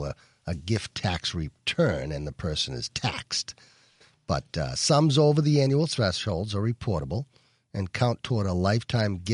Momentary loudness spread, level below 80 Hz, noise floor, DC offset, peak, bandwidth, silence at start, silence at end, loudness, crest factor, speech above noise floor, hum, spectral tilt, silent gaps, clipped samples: 13 LU; -48 dBFS; -60 dBFS; under 0.1%; -8 dBFS; 11 kHz; 0 s; 0 s; -27 LUFS; 18 dB; 34 dB; none; -5.5 dB/octave; none; under 0.1%